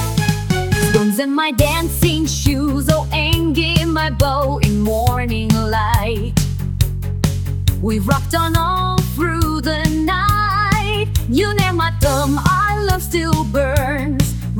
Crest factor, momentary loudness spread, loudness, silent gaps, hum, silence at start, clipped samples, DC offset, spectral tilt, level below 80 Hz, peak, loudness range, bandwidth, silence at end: 16 dB; 4 LU; -17 LUFS; none; none; 0 s; under 0.1%; under 0.1%; -5 dB/octave; -24 dBFS; 0 dBFS; 2 LU; 19 kHz; 0 s